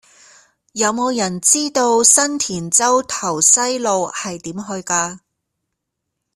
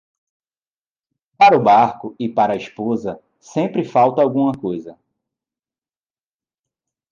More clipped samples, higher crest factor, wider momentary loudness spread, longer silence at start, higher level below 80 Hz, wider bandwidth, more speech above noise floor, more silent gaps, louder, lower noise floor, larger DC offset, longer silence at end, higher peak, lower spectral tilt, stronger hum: neither; about the same, 18 dB vs 16 dB; about the same, 15 LU vs 14 LU; second, 0.75 s vs 1.4 s; about the same, -60 dBFS vs -62 dBFS; first, 15.5 kHz vs 7.4 kHz; second, 60 dB vs over 73 dB; neither; about the same, -15 LUFS vs -17 LUFS; second, -77 dBFS vs under -90 dBFS; neither; second, 1.2 s vs 2.2 s; first, 0 dBFS vs -4 dBFS; second, -2 dB/octave vs -7 dB/octave; neither